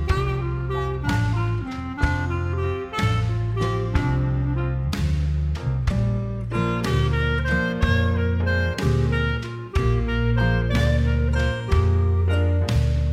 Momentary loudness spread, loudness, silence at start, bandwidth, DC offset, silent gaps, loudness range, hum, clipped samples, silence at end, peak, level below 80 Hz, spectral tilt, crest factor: 5 LU; -23 LUFS; 0 s; 11.5 kHz; under 0.1%; none; 3 LU; none; under 0.1%; 0 s; -6 dBFS; -28 dBFS; -7 dB/octave; 16 dB